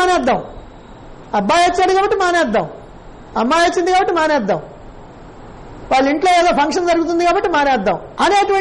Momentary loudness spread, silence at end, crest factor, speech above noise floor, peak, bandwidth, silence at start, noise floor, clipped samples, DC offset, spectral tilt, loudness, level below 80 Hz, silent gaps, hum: 8 LU; 0 s; 10 dB; 22 dB; -6 dBFS; 11.5 kHz; 0 s; -36 dBFS; under 0.1%; under 0.1%; -4 dB/octave; -15 LUFS; -40 dBFS; none; none